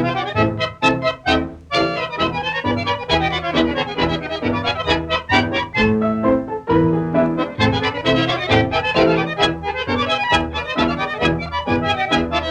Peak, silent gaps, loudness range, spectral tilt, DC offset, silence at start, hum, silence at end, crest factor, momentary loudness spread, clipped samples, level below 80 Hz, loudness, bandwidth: -2 dBFS; none; 2 LU; -6 dB/octave; under 0.1%; 0 s; none; 0 s; 18 dB; 4 LU; under 0.1%; -38 dBFS; -18 LUFS; 9.8 kHz